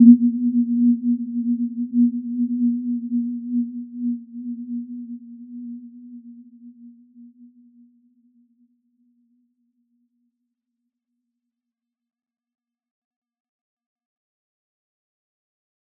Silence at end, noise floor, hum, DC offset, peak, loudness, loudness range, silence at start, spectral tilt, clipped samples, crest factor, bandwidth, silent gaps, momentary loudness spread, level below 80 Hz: 8.55 s; -85 dBFS; none; under 0.1%; -2 dBFS; -22 LUFS; 21 LU; 0 s; -17 dB/octave; under 0.1%; 24 dB; 0.4 kHz; none; 20 LU; -80 dBFS